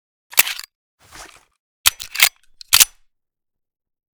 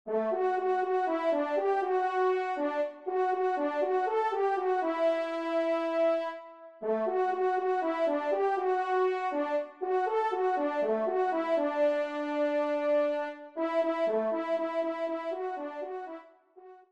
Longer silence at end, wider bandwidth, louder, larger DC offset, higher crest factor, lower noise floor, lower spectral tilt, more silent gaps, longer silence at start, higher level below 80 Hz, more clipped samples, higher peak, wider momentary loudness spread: first, 1.3 s vs 0.15 s; first, over 20 kHz vs 8.2 kHz; first, -15 LUFS vs -30 LUFS; neither; first, 22 dB vs 12 dB; first, -75 dBFS vs -54 dBFS; second, 3 dB/octave vs -5.5 dB/octave; first, 0.75-0.98 s, 1.59-1.84 s vs none; first, 0.35 s vs 0.05 s; first, -52 dBFS vs -82 dBFS; first, 0.1% vs under 0.1%; first, 0 dBFS vs -18 dBFS; about the same, 6 LU vs 7 LU